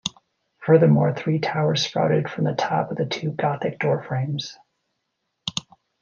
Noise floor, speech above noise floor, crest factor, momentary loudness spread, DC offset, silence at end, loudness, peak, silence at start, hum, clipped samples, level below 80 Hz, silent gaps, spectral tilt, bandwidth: -77 dBFS; 56 dB; 20 dB; 13 LU; under 0.1%; 0.4 s; -22 LUFS; -2 dBFS; 0.05 s; none; under 0.1%; -64 dBFS; none; -6 dB/octave; 7.2 kHz